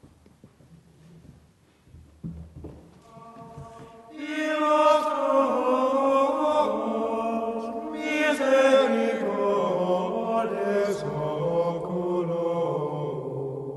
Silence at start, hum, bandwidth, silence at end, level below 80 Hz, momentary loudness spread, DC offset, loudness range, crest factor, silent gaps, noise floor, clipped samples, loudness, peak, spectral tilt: 0.45 s; none; 12 kHz; 0 s; -58 dBFS; 21 LU; under 0.1%; 6 LU; 18 dB; none; -58 dBFS; under 0.1%; -25 LUFS; -8 dBFS; -6 dB/octave